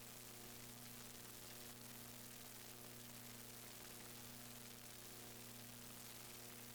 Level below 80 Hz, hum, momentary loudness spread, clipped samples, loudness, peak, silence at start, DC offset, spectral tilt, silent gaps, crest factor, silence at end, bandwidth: -74 dBFS; 60 Hz at -65 dBFS; 1 LU; under 0.1%; -54 LUFS; -42 dBFS; 0 s; under 0.1%; -2.5 dB/octave; none; 14 dB; 0 s; over 20 kHz